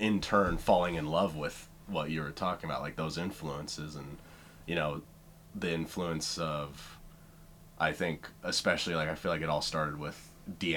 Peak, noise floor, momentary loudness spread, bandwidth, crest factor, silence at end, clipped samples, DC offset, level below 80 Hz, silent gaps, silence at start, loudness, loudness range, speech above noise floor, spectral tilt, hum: -12 dBFS; -55 dBFS; 19 LU; 19 kHz; 22 dB; 0 s; under 0.1%; under 0.1%; -52 dBFS; none; 0 s; -33 LUFS; 5 LU; 21 dB; -4.5 dB/octave; none